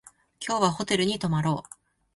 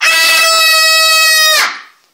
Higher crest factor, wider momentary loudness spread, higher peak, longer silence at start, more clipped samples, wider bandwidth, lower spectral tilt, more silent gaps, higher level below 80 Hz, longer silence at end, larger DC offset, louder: first, 18 dB vs 10 dB; first, 8 LU vs 4 LU; second, -10 dBFS vs 0 dBFS; first, 0.4 s vs 0 s; neither; second, 11.5 kHz vs 16 kHz; first, -5 dB/octave vs 4.5 dB/octave; neither; first, -60 dBFS vs -68 dBFS; first, 0.55 s vs 0.3 s; neither; second, -26 LUFS vs -6 LUFS